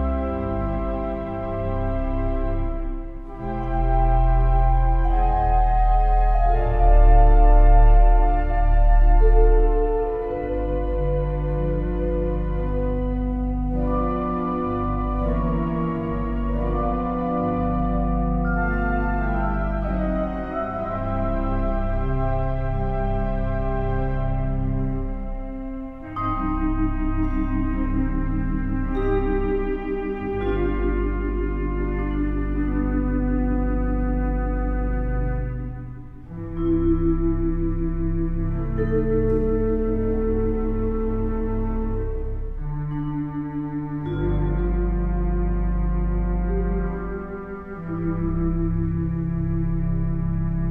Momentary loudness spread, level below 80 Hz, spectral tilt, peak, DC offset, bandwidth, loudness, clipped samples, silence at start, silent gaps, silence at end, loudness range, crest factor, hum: 8 LU; -22 dBFS; -11 dB/octave; -6 dBFS; under 0.1%; 3.6 kHz; -24 LUFS; under 0.1%; 0 s; none; 0 s; 7 LU; 16 dB; none